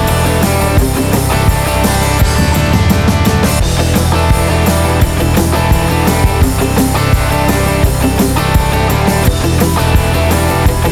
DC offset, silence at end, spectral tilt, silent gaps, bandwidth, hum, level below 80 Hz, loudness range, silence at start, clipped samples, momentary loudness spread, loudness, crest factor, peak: under 0.1%; 0 s; -5.5 dB/octave; none; 16 kHz; none; -16 dBFS; 0 LU; 0 s; under 0.1%; 1 LU; -11 LUFS; 10 dB; 0 dBFS